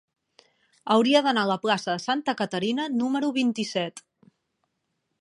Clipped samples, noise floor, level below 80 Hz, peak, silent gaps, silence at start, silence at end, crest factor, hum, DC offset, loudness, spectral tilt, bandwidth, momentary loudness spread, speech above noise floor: under 0.1%; -78 dBFS; -76 dBFS; -8 dBFS; none; 0.85 s; 1.2 s; 20 dB; none; under 0.1%; -25 LUFS; -4.5 dB/octave; 11 kHz; 8 LU; 53 dB